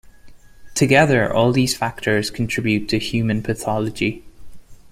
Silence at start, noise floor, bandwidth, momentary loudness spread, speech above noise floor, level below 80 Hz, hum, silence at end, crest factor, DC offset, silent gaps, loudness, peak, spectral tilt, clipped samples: 0.25 s; -42 dBFS; 16 kHz; 9 LU; 23 dB; -44 dBFS; none; 0 s; 18 dB; under 0.1%; none; -19 LUFS; -2 dBFS; -5 dB/octave; under 0.1%